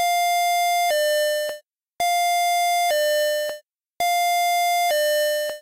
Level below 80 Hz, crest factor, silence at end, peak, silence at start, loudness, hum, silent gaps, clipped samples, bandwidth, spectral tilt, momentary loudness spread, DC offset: -70 dBFS; 6 dB; 0 s; -16 dBFS; 0 s; -21 LUFS; none; none; under 0.1%; 16 kHz; 2 dB/octave; 6 LU; 0.1%